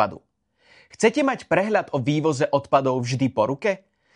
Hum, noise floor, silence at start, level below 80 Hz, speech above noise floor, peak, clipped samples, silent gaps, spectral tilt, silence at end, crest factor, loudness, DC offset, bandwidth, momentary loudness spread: none; -59 dBFS; 0 s; -62 dBFS; 38 dB; -4 dBFS; under 0.1%; none; -6 dB/octave; 0.4 s; 18 dB; -22 LUFS; under 0.1%; 11 kHz; 5 LU